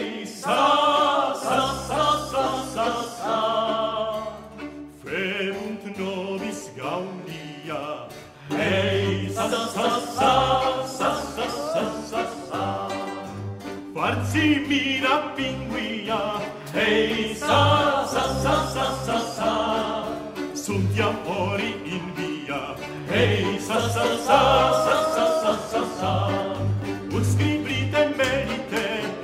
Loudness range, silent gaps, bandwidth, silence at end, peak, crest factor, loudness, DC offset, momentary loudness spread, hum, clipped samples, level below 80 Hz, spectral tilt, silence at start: 7 LU; none; 16 kHz; 0 s; -4 dBFS; 20 dB; -24 LUFS; under 0.1%; 12 LU; none; under 0.1%; -48 dBFS; -5 dB/octave; 0 s